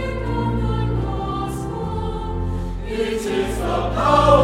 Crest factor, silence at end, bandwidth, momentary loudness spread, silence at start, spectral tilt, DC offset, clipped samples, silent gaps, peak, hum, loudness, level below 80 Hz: 20 dB; 0 s; 15.5 kHz; 9 LU; 0 s; -6.5 dB/octave; under 0.1%; under 0.1%; none; 0 dBFS; none; -22 LUFS; -28 dBFS